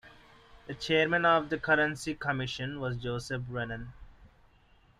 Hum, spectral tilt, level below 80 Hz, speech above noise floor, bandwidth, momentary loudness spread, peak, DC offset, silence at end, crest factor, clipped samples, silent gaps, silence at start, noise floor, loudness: none; -5 dB/octave; -56 dBFS; 32 dB; 13.5 kHz; 14 LU; -12 dBFS; under 0.1%; 0.7 s; 20 dB; under 0.1%; none; 0.05 s; -62 dBFS; -30 LUFS